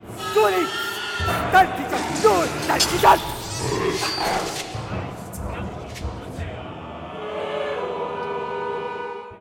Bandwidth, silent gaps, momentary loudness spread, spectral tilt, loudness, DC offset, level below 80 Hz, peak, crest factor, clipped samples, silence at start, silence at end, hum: 17 kHz; none; 15 LU; -3.5 dB/octave; -23 LUFS; under 0.1%; -42 dBFS; -4 dBFS; 18 dB; under 0.1%; 0 s; 0 s; none